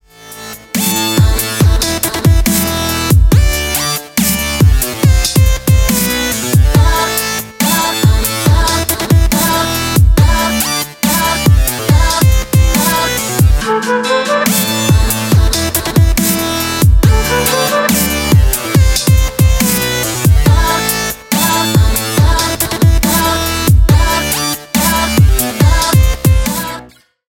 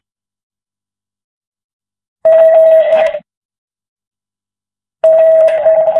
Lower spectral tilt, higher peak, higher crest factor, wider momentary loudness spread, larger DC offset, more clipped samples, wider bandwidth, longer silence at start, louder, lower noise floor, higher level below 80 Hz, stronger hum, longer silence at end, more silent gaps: about the same, -4 dB/octave vs -4 dB/octave; about the same, 0 dBFS vs 0 dBFS; about the same, 10 dB vs 12 dB; second, 4 LU vs 9 LU; neither; neither; first, 18 kHz vs 4.1 kHz; second, 0.2 s vs 2.25 s; about the same, -11 LUFS vs -9 LUFS; second, -38 dBFS vs under -90 dBFS; first, -16 dBFS vs -62 dBFS; second, none vs 50 Hz at -60 dBFS; first, 0.4 s vs 0 s; second, none vs 3.37-3.49 s, 3.58-3.68 s, 3.88-3.96 s, 4.07-4.11 s